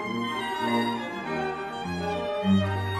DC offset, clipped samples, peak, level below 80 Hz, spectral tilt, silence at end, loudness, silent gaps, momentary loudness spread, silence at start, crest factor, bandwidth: under 0.1%; under 0.1%; -12 dBFS; -58 dBFS; -6.5 dB/octave; 0 s; -28 LUFS; none; 7 LU; 0 s; 16 dB; 14 kHz